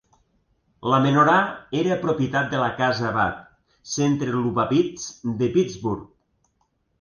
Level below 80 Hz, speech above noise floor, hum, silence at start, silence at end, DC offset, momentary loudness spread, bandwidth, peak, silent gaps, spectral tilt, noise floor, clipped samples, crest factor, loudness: -54 dBFS; 48 dB; none; 0.85 s; 0.95 s; under 0.1%; 12 LU; 10 kHz; -6 dBFS; none; -5.5 dB/octave; -70 dBFS; under 0.1%; 18 dB; -22 LUFS